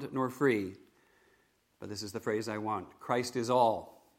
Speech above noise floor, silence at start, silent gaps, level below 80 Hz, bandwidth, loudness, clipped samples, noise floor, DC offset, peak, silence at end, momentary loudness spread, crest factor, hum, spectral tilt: 38 dB; 0 s; none; -74 dBFS; 16.5 kHz; -33 LUFS; under 0.1%; -71 dBFS; under 0.1%; -14 dBFS; 0.25 s; 14 LU; 20 dB; none; -5 dB/octave